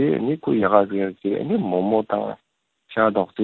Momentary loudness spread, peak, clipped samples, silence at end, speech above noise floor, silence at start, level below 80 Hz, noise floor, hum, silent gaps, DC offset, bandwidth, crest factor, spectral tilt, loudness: 9 LU; 0 dBFS; under 0.1%; 0 s; 29 dB; 0 s; -60 dBFS; -50 dBFS; none; none; under 0.1%; 4.3 kHz; 22 dB; -10.5 dB/octave; -21 LUFS